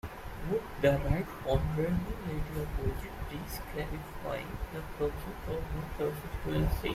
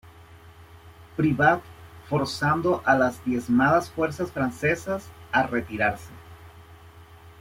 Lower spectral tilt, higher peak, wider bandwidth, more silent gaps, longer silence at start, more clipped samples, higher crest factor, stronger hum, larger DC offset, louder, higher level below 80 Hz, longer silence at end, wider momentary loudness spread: about the same, -7 dB/octave vs -6 dB/octave; second, -12 dBFS vs -6 dBFS; about the same, 16 kHz vs 16.5 kHz; neither; second, 0.05 s vs 0.2 s; neither; about the same, 22 dB vs 20 dB; neither; neither; second, -35 LUFS vs -24 LUFS; first, -40 dBFS vs -54 dBFS; about the same, 0 s vs 0.1 s; about the same, 11 LU vs 9 LU